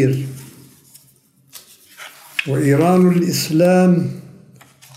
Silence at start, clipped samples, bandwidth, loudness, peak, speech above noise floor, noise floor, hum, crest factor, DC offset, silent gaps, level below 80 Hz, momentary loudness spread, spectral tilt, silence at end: 0 s; under 0.1%; 16 kHz; -16 LUFS; -2 dBFS; 40 dB; -54 dBFS; none; 16 dB; under 0.1%; none; -62 dBFS; 24 LU; -6.5 dB/octave; 0.75 s